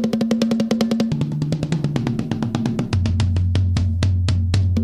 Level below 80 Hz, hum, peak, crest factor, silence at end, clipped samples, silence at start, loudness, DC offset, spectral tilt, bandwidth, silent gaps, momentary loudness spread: -34 dBFS; none; -6 dBFS; 14 dB; 0 s; under 0.1%; 0 s; -20 LUFS; under 0.1%; -7 dB/octave; 11 kHz; none; 4 LU